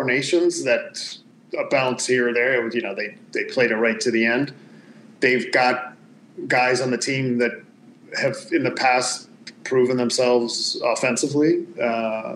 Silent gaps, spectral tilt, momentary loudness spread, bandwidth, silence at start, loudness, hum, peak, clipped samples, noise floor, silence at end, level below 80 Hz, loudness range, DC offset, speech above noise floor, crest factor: none; -3.5 dB/octave; 12 LU; 12 kHz; 0 s; -21 LUFS; none; -4 dBFS; under 0.1%; -46 dBFS; 0 s; -84 dBFS; 2 LU; under 0.1%; 25 dB; 18 dB